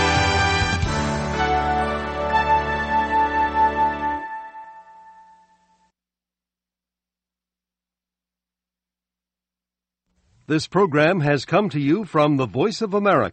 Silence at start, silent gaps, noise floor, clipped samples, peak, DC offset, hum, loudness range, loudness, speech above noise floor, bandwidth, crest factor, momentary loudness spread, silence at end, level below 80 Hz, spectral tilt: 0 s; none; -89 dBFS; under 0.1%; -4 dBFS; under 0.1%; 60 Hz at -70 dBFS; 10 LU; -20 LUFS; 70 dB; 8.8 kHz; 20 dB; 7 LU; 0 s; -38 dBFS; -5.5 dB/octave